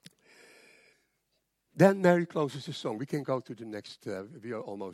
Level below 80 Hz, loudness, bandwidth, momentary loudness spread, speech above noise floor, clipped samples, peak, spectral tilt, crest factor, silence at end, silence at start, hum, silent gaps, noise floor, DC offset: -80 dBFS; -30 LUFS; 15 kHz; 18 LU; 49 dB; under 0.1%; -8 dBFS; -7 dB/octave; 22 dB; 0 s; 1.75 s; none; none; -79 dBFS; under 0.1%